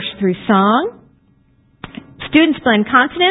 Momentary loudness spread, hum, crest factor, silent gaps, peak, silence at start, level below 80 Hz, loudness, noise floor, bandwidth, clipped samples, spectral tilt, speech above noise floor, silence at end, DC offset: 21 LU; none; 16 dB; none; 0 dBFS; 0 s; -50 dBFS; -14 LUFS; -54 dBFS; 4 kHz; under 0.1%; -9 dB/octave; 41 dB; 0 s; under 0.1%